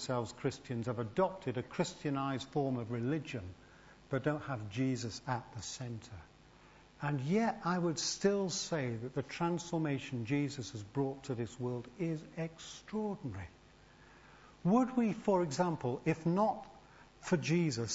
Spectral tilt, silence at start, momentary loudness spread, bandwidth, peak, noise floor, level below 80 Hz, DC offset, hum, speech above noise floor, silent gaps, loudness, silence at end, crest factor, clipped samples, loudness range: -6 dB/octave; 0 s; 12 LU; 7.6 kHz; -18 dBFS; -61 dBFS; -66 dBFS; under 0.1%; none; 25 dB; none; -36 LUFS; 0 s; 20 dB; under 0.1%; 6 LU